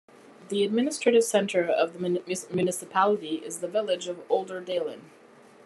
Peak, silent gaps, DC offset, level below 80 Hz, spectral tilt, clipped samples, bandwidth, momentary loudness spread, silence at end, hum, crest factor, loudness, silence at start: -8 dBFS; none; under 0.1%; -78 dBFS; -4 dB/octave; under 0.1%; 13 kHz; 9 LU; 0.6 s; none; 18 dB; -27 LUFS; 0.4 s